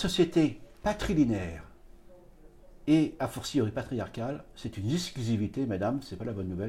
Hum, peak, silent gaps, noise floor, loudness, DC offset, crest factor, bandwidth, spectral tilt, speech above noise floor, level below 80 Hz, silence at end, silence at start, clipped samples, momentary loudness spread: none; -12 dBFS; none; -53 dBFS; -31 LUFS; under 0.1%; 18 dB; 15 kHz; -6 dB/octave; 24 dB; -50 dBFS; 0 s; 0 s; under 0.1%; 11 LU